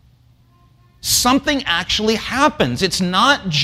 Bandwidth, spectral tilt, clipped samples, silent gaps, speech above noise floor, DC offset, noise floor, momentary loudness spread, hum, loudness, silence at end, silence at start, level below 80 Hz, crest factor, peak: 16 kHz; -3 dB/octave; under 0.1%; none; 35 dB; under 0.1%; -52 dBFS; 4 LU; none; -16 LUFS; 0 s; 1.05 s; -42 dBFS; 16 dB; -2 dBFS